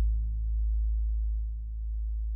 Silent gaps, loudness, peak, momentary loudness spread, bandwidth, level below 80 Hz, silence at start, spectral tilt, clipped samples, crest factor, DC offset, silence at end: none; -33 LUFS; -20 dBFS; 6 LU; 0.2 kHz; -30 dBFS; 0 s; -25 dB/octave; under 0.1%; 8 dB; under 0.1%; 0 s